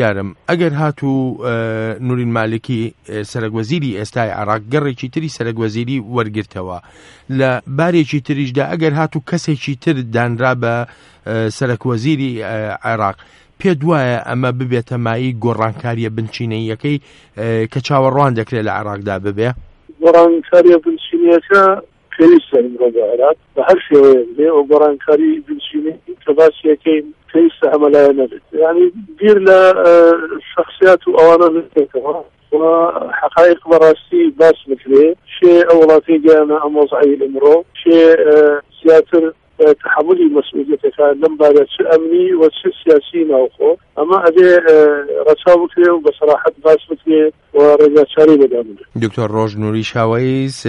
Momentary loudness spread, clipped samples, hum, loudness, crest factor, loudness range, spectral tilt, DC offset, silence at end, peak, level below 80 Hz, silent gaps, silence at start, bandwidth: 13 LU; under 0.1%; none; -12 LUFS; 12 dB; 9 LU; -7.5 dB/octave; under 0.1%; 0 s; 0 dBFS; -52 dBFS; none; 0 s; 10.5 kHz